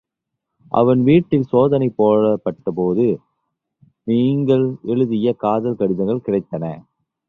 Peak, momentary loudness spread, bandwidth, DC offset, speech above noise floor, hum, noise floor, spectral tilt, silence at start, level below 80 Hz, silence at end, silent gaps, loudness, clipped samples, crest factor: -2 dBFS; 10 LU; 4.1 kHz; under 0.1%; 63 dB; none; -80 dBFS; -10.5 dB/octave; 0.7 s; -54 dBFS; 0.5 s; none; -18 LUFS; under 0.1%; 16 dB